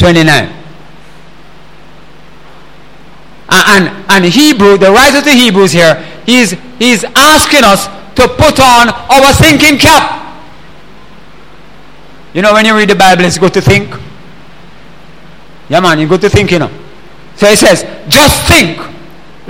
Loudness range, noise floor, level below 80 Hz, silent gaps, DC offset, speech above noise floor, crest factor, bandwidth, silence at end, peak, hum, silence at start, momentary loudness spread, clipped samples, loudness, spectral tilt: 7 LU; -36 dBFS; -28 dBFS; none; 3%; 30 dB; 8 dB; over 20 kHz; 0.55 s; 0 dBFS; none; 0 s; 9 LU; 2%; -5 LUFS; -3.5 dB/octave